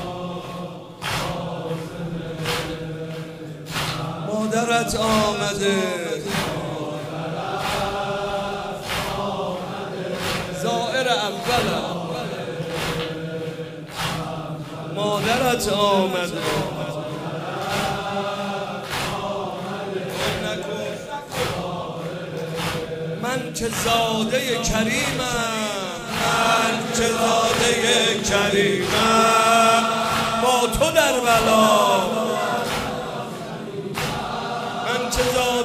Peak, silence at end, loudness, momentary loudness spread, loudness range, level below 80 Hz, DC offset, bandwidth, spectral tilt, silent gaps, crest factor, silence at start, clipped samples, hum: -2 dBFS; 0 s; -22 LUFS; 13 LU; 10 LU; -44 dBFS; under 0.1%; 15.5 kHz; -3.5 dB/octave; none; 20 dB; 0 s; under 0.1%; none